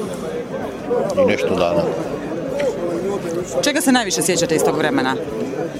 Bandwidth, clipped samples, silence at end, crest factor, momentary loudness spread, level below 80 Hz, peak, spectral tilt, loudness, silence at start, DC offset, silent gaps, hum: 16 kHz; under 0.1%; 0 s; 18 dB; 9 LU; -48 dBFS; 0 dBFS; -4 dB/octave; -19 LUFS; 0 s; under 0.1%; none; none